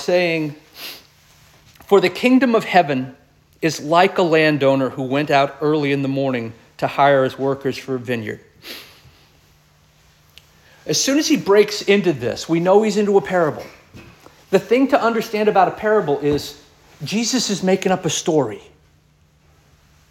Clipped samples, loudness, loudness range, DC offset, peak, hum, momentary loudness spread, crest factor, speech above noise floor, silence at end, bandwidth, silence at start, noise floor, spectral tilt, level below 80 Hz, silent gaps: under 0.1%; -18 LUFS; 5 LU; under 0.1%; -2 dBFS; none; 18 LU; 18 dB; 38 dB; 1.5 s; 16.5 kHz; 0 s; -56 dBFS; -4.5 dB/octave; -56 dBFS; none